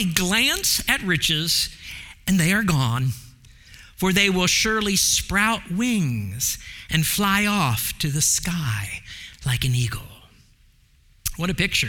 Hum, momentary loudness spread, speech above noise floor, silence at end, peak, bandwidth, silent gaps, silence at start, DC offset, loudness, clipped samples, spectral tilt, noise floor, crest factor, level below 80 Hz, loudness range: none; 13 LU; 34 dB; 0 s; -2 dBFS; 18 kHz; none; 0 s; under 0.1%; -21 LUFS; under 0.1%; -3 dB/octave; -56 dBFS; 20 dB; -42 dBFS; 5 LU